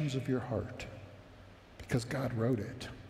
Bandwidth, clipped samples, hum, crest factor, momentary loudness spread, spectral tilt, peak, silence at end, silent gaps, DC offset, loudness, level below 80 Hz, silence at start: 15 kHz; under 0.1%; none; 18 dB; 21 LU; -6.5 dB/octave; -18 dBFS; 0 s; none; under 0.1%; -36 LUFS; -58 dBFS; 0 s